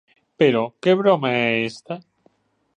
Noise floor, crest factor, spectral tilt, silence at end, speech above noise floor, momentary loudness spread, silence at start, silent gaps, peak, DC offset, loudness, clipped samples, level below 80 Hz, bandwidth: -62 dBFS; 18 dB; -6.5 dB/octave; 0.75 s; 43 dB; 17 LU; 0.4 s; none; -2 dBFS; under 0.1%; -19 LUFS; under 0.1%; -68 dBFS; 9.8 kHz